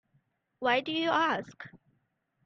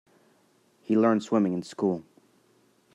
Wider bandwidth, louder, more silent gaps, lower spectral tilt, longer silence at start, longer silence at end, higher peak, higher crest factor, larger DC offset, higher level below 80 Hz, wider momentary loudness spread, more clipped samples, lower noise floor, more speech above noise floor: second, 7.4 kHz vs 10.5 kHz; second, -29 LUFS vs -26 LUFS; neither; second, -4.5 dB/octave vs -7.5 dB/octave; second, 0.6 s vs 0.9 s; second, 0.7 s vs 0.95 s; second, -14 dBFS vs -10 dBFS; about the same, 18 dB vs 20 dB; neither; about the same, -76 dBFS vs -78 dBFS; first, 21 LU vs 10 LU; neither; first, -76 dBFS vs -65 dBFS; first, 46 dB vs 40 dB